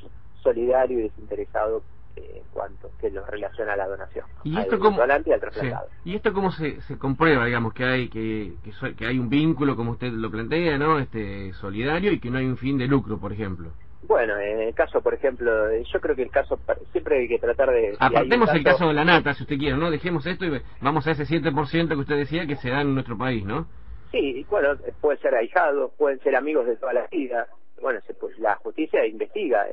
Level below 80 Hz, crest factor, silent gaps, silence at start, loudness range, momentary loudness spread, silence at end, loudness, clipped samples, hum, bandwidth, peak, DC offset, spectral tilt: -44 dBFS; 18 dB; none; 0.05 s; 6 LU; 12 LU; 0 s; -24 LUFS; under 0.1%; none; 5.8 kHz; -6 dBFS; 1%; -9.5 dB/octave